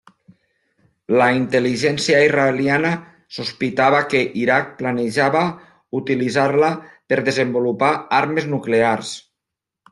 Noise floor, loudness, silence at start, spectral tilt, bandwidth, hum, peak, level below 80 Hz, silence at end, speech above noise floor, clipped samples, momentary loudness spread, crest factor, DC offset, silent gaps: -84 dBFS; -18 LUFS; 1.1 s; -5 dB/octave; 12 kHz; none; -2 dBFS; -60 dBFS; 0.7 s; 66 dB; under 0.1%; 11 LU; 16 dB; under 0.1%; none